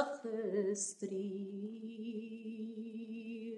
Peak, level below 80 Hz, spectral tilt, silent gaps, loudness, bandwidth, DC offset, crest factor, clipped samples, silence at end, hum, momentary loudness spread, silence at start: -20 dBFS; under -90 dBFS; -5 dB/octave; none; -42 LUFS; 11.5 kHz; under 0.1%; 22 dB; under 0.1%; 0 s; none; 9 LU; 0 s